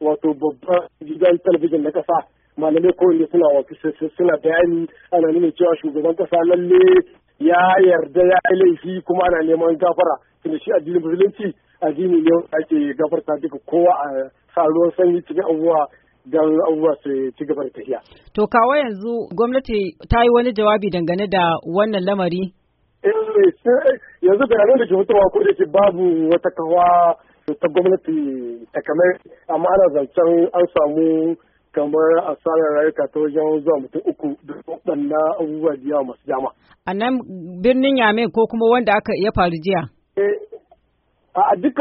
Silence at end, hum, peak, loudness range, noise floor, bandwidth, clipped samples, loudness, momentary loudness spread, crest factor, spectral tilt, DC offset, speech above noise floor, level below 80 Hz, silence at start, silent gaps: 0 s; none; -2 dBFS; 5 LU; -64 dBFS; 4.8 kHz; under 0.1%; -17 LUFS; 11 LU; 14 dB; -5 dB/octave; under 0.1%; 47 dB; -44 dBFS; 0 s; none